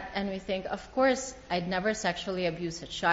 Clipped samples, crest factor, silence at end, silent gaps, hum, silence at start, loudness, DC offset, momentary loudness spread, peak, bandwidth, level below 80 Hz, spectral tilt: under 0.1%; 20 dB; 0 s; none; none; 0 s; -31 LUFS; under 0.1%; 7 LU; -12 dBFS; 8 kHz; -54 dBFS; -3 dB/octave